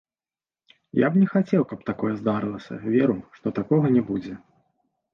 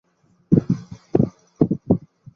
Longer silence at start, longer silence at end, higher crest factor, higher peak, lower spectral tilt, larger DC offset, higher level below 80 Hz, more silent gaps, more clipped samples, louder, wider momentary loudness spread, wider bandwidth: first, 0.95 s vs 0.5 s; first, 0.75 s vs 0.4 s; about the same, 16 dB vs 20 dB; second, -8 dBFS vs -2 dBFS; about the same, -10 dB/octave vs -11 dB/octave; neither; second, -60 dBFS vs -46 dBFS; neither; neither; about the same, -24 LUFS vs -22 LUFS; first, 11 LU vs 6 LU; about the same, 6.6 kHz vs 6.6 kHz